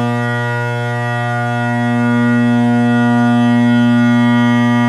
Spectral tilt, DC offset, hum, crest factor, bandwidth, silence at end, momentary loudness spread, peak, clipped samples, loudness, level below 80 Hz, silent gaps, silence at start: -7.5 dB/octave; under 0.1%; none; 10 dB; 11 kHz; 0 s; 6 LU; -4 dBFS; under 0.1%; -13 LUFS; -62 dBFS; none; 0 s